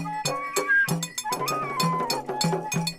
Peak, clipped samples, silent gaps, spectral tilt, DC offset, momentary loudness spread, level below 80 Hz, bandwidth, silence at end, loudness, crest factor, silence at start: -10 dBFS; under 0.1%; none; -3.5 dB/octave; under 0.1%; 7 LU; -60 dBFS; 16 kHz; 0 s; -25 LUFS; 16 dB; 0 s